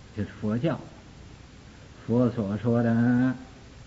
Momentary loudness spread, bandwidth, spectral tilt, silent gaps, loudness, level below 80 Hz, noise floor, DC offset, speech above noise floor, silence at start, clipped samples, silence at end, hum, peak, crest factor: 18 LU; 7.8 kHz; -8.5 dB/octave; none; -26 LUFS; -54 dBFS; -48 dBFS; under 0.1%; 23 dB; 0.05 s; under 0.1%; 0.05 s; none; -10 dBFS; 16 dB